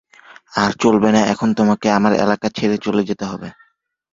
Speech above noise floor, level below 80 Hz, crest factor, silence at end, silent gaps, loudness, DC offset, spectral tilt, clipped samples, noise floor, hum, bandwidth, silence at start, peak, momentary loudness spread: 45 dB; -52 dBFS; 18 dB; 0.6 s; none; -17 LUFS; under 0.1%; -5.5 dB/octave; under 0.1%; -61 dBFS; none; 7.6 kHz; 0.55 s; 0 dBFS; 11 LU